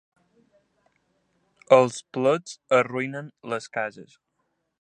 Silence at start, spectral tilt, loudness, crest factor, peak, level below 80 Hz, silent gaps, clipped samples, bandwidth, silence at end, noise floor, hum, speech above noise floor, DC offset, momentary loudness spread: 1.7 s; -5 dB/octave; -24 LUFS; 24 dB; -2 dBFS; -76 dBFS; none; under 0.1%; 9.6 kHz; 0.8 s; -76 dBFS; none; 52 dB; under 0.1%; 14 LU